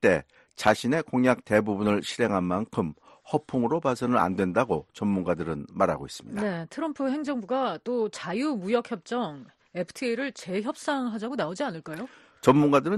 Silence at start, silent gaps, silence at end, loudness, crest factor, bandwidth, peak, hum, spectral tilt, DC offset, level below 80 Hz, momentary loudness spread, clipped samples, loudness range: 0 s; none; 0 s; -27 LUFS; 20 dB; 12.5 kHz; -6 dBFS; none; -6 dB/octave; under 0.1%; -60 dBFS; 10 LU; under 0.1%; 4 LU